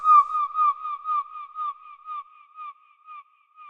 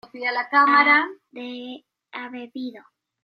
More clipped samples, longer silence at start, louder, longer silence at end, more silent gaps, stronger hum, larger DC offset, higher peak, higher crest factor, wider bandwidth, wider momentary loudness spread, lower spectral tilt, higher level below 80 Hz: neither; second, 0 s vs 0.15 s; second, -24 LUFS vs -18 LUFS; second, 0 s vs 0.45 s; neither; neither; neither; second, -8 dBFS vs -2 dBFS; about the same, 18 dB vs 20 dB; second, 5.2 kHz vs 5.8 kHz; first, 25 LU vs 21 LU; second, 0 dB/octave vs -4.5 dB/octave; about the same, -78 dBFS vs -82 dBFS